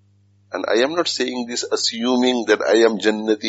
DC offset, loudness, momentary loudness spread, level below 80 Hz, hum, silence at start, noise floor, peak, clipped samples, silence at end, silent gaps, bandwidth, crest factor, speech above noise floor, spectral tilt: under 0.1%; -19 LUFS; 8 LU; -68 dBFS; 50 Hz at -55 dBFS; 0.5 s; -56 dBFS; -2 dBFS; under 0.1%; 0 s; none; 8 kHz; 16 dB; 38 dB; -1.5 dB/octave